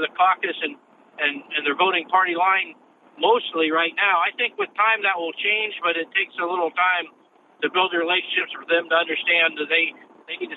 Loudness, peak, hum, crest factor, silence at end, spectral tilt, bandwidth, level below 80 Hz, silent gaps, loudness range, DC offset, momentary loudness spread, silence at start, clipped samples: -21 LUFS; -6 dBFS; none; 18 dB; 0 s; -5 dB/octave; 4.1 kHz; under -90 dBFS; none; 2 LU; under 0.1%; 6 LU; 0 s; under 0.1%